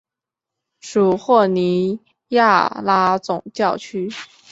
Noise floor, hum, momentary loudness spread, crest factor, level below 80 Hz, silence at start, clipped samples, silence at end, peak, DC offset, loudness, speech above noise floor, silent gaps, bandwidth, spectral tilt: -86 dBFS; none; 12 LU; 18 dB; -62 dBFS; 0.85 s; under 0.1%; 0.25 s; -2 dBFS; under 0.1%; -18 LUFS; 69 dB; none; 8 kHz; -6 dB/octave